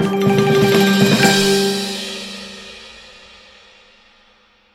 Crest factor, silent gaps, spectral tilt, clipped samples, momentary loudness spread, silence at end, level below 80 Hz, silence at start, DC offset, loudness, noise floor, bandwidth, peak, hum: 16 dB; none; -4.5 dB/octave; under 0.1%; 22 LU; 1.8 s; -48 dBFS; 0 s; under 0.1%; -14 LUFS; -54 dBFS; 16.5 kHz; 0 dBFS; none